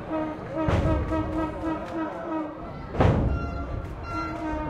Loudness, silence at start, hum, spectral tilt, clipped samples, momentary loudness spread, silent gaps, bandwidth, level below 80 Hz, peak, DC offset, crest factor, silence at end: -28 LUFS; 0 s; none; -8.5 dB/octave; under 0.1%; 11 LU; none; 9.4 kHz; -34 dBFS; -8 dBFS; under 0.1%; 18 dB; 0 s